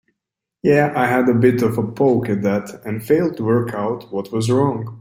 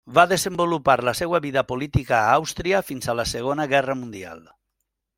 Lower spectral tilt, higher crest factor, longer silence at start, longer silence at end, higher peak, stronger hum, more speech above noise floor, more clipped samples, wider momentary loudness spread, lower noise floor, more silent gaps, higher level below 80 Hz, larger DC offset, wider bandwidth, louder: first, -7.5 dB/octave vs -4.5 dB/octave; second, 16 dB vs 22 dB; first, 0.65 s vs 0.05 s; second, 0 s vs 0.8 s; about the same, -2 dBFS vs -2 dBFS; neither; first, 65 dB vs 57 dB; neither; about the same, 9 LU vs 9 LU; first, -83 dBFS vs -79 dBFS; neither; second, -56 dBFS vs -44 dBFS; neither; about the same, 16.5 kHz vs 16.5 kHz; first, -18 LUFS vs -22 LUFS